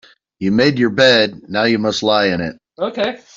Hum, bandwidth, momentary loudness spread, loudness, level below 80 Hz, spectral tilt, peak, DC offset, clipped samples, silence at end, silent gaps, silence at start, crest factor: none; 7.8 kHz; 12 LU; -15 LUFS; -54 dBFS; -5 dB/octave; -2 dBFS; under 0.1%; under 0.1%; 0.2 s; none; 0.4 s; 14 dB